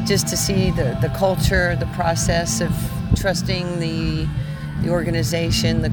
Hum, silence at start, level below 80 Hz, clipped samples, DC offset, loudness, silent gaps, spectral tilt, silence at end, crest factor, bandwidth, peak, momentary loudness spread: none; 0 s; -30 dBFS; under 0.1%; under 0.1%; -20 LUFS; none; -5 dB/octave; 0 s; 16 dB; over 20 kHz; -4 dBFS; 5 LU